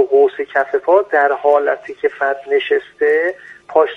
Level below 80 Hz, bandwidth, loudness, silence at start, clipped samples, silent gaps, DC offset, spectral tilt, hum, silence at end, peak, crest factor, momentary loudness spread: -66 dBFS; 4.7 kHz; -16 LUFS; 0 s; under 0.1%; none; under 0.1%; -4.5 dB/octave; none; 0 s; 0 dBFS; 14 dB; 7 LU